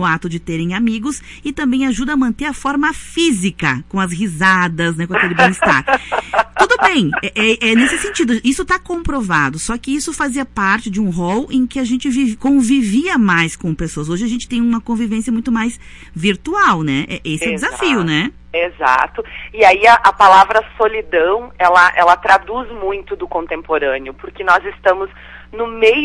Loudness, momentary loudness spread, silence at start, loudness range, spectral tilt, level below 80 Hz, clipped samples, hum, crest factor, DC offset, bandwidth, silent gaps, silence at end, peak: -15 LUFS; 12 LU; 0 s; 6 LU; -4.5 dB/octave; -38 dBFS; under 0.1%; 60 Hz at -40 dBFS; 14 dB; under 0.1%; 11.5 kHz; none; 0 s; 0 dBFS